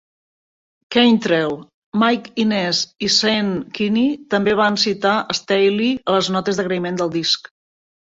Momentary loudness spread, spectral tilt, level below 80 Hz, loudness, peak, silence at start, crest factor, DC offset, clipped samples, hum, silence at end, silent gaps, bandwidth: 6 LU; -4 dB/octave; -58 dBFS; -18 LUFS; -2 dBFS; 0.9 s; 18 dB; under 0.1%; under 0.1%; none; 0.7 s; 1.74-1.92 s; 7.8 kHz